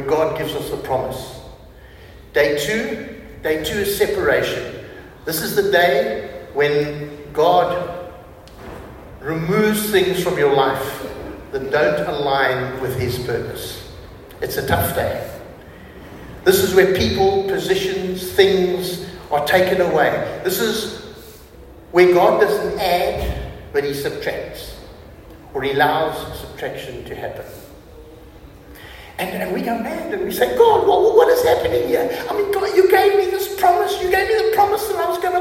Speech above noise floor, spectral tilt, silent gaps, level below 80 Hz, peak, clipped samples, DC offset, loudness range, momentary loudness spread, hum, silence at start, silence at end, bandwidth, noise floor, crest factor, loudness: 24 dB; -4.5 dB/octave; none; -42 dBFS; 0 dBFS; under 0.1%; under 0.1%; 7 LU; 20 LU; none; 0 s; 0 s; 16.5 kHz; -41 dBFS; 18 dB; -18 LUFS